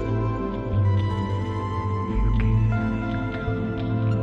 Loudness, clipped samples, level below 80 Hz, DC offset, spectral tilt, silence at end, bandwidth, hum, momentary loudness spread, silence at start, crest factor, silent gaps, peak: -25 LUFS; under 0.1%; -30 dBFS; under 0.1%; -9 dB/octave; 0 s; 6.2 kHz; none; 5 LU; 0 s; 12 dB; none; -12 dBFS